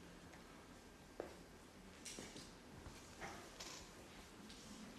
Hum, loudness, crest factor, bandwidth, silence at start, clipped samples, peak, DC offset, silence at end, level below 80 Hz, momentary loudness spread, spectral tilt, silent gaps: none; -56 LUFS; 26 dB; 13 kHz; 0 s; under 0.1%; -30 dBFS; under 0.1%; 0 s; -68 dBFS; 8 LU; -3 dB/octave; none